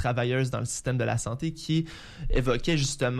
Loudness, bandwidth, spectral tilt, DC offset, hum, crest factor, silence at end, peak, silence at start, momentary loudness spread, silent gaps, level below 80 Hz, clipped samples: -28 LUFS; 14 kHz; -5 dB/octave; under 0.1%; none; 14 dB; 0 s; -14 dBFS; 0 s; 6 LU; none; -36 dBFS; under 0.1%